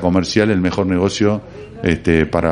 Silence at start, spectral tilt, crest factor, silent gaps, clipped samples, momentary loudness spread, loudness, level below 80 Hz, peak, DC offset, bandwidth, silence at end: 0 s; -6 dB/octave; 16 dB; none; under 0.1%; 7 LU; -17 LUFS; -40 dBFS; 0 dBFS; under 0.1%; 10.5 kHz; 0 s